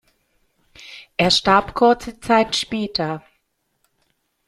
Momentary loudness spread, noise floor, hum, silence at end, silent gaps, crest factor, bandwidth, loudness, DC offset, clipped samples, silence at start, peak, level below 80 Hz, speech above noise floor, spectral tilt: 16 LU; -70 dBFS; none; 1.3 s; none; 20 dB; 14 kHz; -18 LUFS; under 0.1%; under 0.1%; 0.8 s; -2 dBFS; -50 dBFS; 52 dB; -4 dB/octave